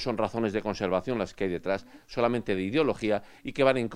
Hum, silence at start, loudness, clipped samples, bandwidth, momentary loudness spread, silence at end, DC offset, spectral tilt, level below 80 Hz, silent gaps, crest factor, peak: none; 0 s; -29 LUFS; under 0.1%; 12.5 kHz; 7 LU; 0 s; under 0.1%; -6.5 dB/octave; -54 dBFS; none; 22 dB; -8 dBFS